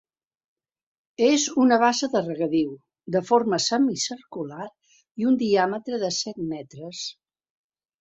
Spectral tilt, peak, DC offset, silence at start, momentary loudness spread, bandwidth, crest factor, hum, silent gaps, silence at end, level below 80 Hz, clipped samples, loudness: -3.5 dB/octave; -6 dBFS; under 0.1%; 1.2 s; 15 LU; 8 kHz; 20 dB; none; 5.11-5.15 s; 0.9 s; -68 dBFS; under 0.1%; -23 LUFS